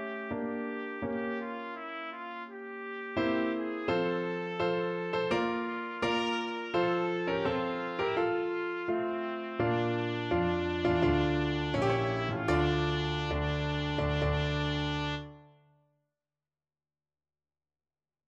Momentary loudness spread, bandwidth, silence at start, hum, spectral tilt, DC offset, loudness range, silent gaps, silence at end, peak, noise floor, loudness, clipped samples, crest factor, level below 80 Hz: 9 LU; 8.6 kHz; 0 s; none; -7 dB/octave; under 0.1%; 6 LU; none; 2.8 s; -16 dBFS; under -90 dBFS; -32 LUFS; under 0.1%; 18 dB; -46 dBFS